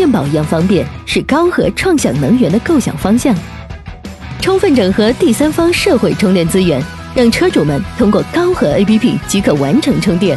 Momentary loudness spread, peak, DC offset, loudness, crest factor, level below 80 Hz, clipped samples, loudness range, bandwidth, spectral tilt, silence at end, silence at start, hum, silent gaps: 7 LU; 0 dBFS; under 0.1%; -12 LUFS; 12 dB; -32 dBFS; under 0.1%; 2 LU; 12.5 kHz; -5.5 dB/octave; 0 s; 0 s; none; none